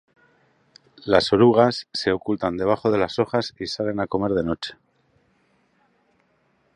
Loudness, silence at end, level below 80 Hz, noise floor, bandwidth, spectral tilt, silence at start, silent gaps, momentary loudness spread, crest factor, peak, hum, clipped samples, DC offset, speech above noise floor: -21 LUFS; 2 s; -52 dBFS; -65 dBFS; 10.5 kHz; -6 dB/octave; 1.05 s; none; 12 LU; 22 dB; 0 dBFS; none; under 0.1%; under 0.1%; 44 dB